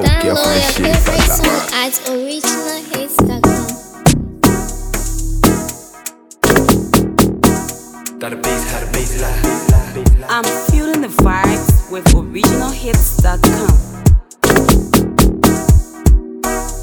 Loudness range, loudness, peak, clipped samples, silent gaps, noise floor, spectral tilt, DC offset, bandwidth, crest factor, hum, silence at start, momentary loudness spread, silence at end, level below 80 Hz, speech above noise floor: 3 LU; -14 LUFS; 0 dBFS; under 0.1%; none; -32 dBFS; -5 dB/octave; under 0.1%; 19.5 kHz; 12 dB; none; 0 s; 9 LU; 0 s; -18 dBFS; 19 dB